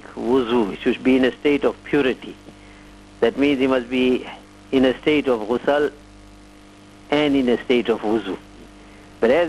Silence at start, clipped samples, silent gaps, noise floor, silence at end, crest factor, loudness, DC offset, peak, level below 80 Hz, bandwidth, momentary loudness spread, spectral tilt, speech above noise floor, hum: 0.05 s; under 0.1%; none; -45 dBFS; 0 s; 14 dB; -20 LUFS; under 0.1%; -6 dBFS; -48 dBFS; 12 kHz; 7 LU; -6 dB/octave; 26 dB; 50 Hz at -50 dBFS